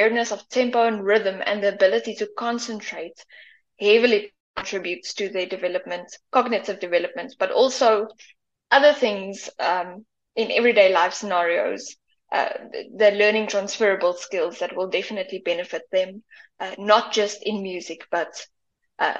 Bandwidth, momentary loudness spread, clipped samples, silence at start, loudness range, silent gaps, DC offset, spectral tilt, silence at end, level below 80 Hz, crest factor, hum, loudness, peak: 8.2 kHz; 15 LU; under 0.1%; 0 s; 4 LU; 4.40-4.54 s; under 0.1%; -3 dB/octave; 0 s; -70 dBFS; 20 dB; none; -22 LUFS; -2 dBFS